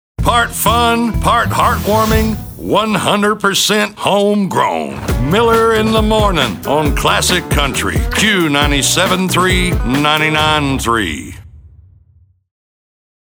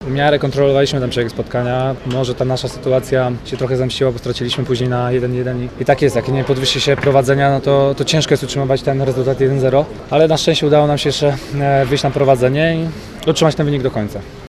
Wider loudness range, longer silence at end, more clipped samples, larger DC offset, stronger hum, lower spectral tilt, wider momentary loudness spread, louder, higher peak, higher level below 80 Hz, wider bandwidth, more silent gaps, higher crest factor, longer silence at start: about the same, 2 LU vs 4 LU; first, 1.65 s vs 0 s; neither; neither; neither; second, -4 dB/octave vs -5.5 dB/octave; about the same, 5 LU vs 7 LU; about the same, -13 LUFS vs -15 LUFS; about the same, -2 dBFS vs 0 dBFS; first, -26 dBFS vs -38 dBFS; first, over 20 kHz vs 13.5 kHz; neither; about the same, 12 dB vs 16 dB; first, 0.2 s vs 0 s